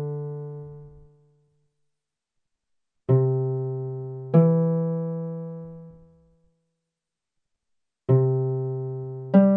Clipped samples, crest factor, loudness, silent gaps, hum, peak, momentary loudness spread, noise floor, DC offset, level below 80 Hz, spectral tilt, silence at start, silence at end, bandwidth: under 0.1%; 20 dB; -24 LUFS; none; none; -6 dBFS; 19 LU; -86 dBFS; under 0.1%; -64 dBFS; -13 dB/octave; 0 s; 0 s; 3 kHz